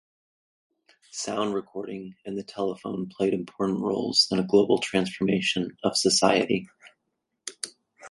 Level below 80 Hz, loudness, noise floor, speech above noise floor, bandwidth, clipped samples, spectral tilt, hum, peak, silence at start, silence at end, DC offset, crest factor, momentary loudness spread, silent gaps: -64 dBFS; -25 LUFS; -80 dBFS; 54 dB; 11.5 kHz; under 0.1%; -3.5 dB/octave; none; -6 dBFS; 1.15 s; 0 s; under 0.1%; 22 dB; 16 LU; none